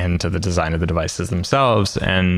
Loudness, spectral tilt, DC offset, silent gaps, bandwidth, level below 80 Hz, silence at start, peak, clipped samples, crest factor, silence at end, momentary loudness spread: -19 LUFS; -5.5 dB/octave; under 0.1%; none; 13 kHz; -34 dBFS; 0 s; -2 dBFS; under 0.1%; 16 dB; 0 s; 6 LU